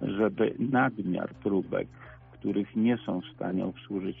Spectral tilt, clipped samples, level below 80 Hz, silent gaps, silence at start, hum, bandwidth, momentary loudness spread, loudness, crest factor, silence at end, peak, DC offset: -6 dB/octave; under 0.1%; -60 dBFS; none; 0 s; none; 3.7 kHz; 9 LU; -30 LUFS; 16 dB; 0 s; -14 dBFS; under 0.1%